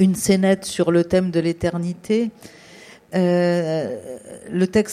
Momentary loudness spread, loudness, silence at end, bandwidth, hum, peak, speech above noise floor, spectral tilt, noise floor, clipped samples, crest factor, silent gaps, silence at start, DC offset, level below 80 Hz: 11 LU; -20 LUFS; 0 s; 15 kHz; none; -4 dBFS; 25 dB; -6 dB/octave; -45 dBFS; under 0.1%; 16 dB; none; 0 s; under 0.1%; -52 dBFS